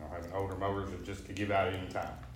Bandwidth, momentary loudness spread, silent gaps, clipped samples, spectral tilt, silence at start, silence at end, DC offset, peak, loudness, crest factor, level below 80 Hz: 16 kHz; 10 LU; none; under 0.1%; -6 dB/octave; 0 s; 0 s; under 0.1%; -18 dBFS; -36 LUFS; 18 dB; -52 dBFS